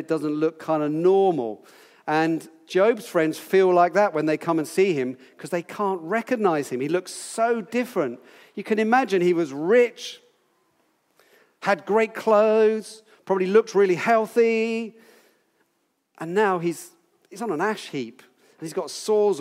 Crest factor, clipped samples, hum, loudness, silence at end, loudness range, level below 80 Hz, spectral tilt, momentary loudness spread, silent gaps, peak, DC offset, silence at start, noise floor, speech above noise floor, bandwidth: 18 dB; under 0.1%; none; -23 LUFS; 0 s; 6 LU; -86 dBFS; -5.5 dB/octave; 14 LU; none; -6 dBFS; under 0.1%; 0 s; -72 dBFS; 50 dB; 16 kHz